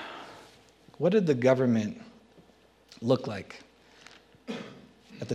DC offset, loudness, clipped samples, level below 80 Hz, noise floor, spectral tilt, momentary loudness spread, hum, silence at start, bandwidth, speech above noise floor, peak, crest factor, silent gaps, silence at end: under 0.1%; -28 LUFS; under 0.1%; -72 dBFS; -60 dBFS; -7 dB/octave; 24 LU; none; 0 s; 11 kHz; 34 dB; -10 dBFS; 20 dB; none; 0 s